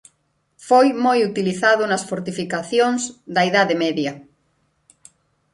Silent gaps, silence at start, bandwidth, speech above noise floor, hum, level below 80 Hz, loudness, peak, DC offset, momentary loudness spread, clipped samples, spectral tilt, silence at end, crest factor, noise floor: none; 0.6 s; 11.5 kHz; 49 dB; none; -66 dBFS; -19 LUFS; -4 dBFS; under 0.1%; 10 LU; under 0.1%; -4.5 dB/octave; 1.35 s; 16 dB; -67 dBFS